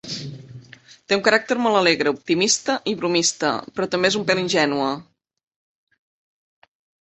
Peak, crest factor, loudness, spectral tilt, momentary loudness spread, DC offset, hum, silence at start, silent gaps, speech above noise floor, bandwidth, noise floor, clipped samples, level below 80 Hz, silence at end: -2 dBFS; 22 dB; -20 LUFS; -3 dB/octave; 11 LU; under 0.1%; none; 0.05 s; none; 26 dB; 8.4 kHz; -47 dBFS; under 0.1%; -64 dBFS; 2 s